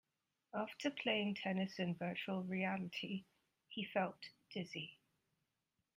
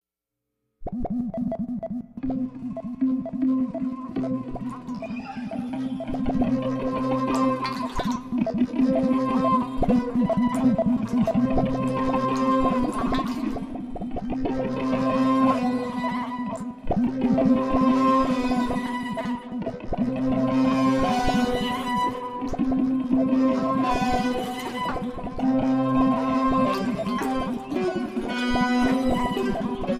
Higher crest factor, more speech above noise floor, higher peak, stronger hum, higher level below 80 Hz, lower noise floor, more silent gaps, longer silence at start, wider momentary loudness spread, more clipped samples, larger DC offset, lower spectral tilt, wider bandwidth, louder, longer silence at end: first, 22 dB vs 16 dB; second, 46 dB vs 59 dB; second, -22 dBFS vs -8 dBFS; neither; second, -84 dBFS vs -40 dBFS; about the same, -88 dBFS vs -85 dBFS; neither; second, 0.55 s vs 0.8 s; about the same, 11 LU vs 10 LU; neither; neither; about the same, -6 dB/octave vs -7 dB/octave; first, 15.5 kHz vs 11.5 kHz; second, -43 LUFS vs -25 LUFS; first, 1 s vs 0 s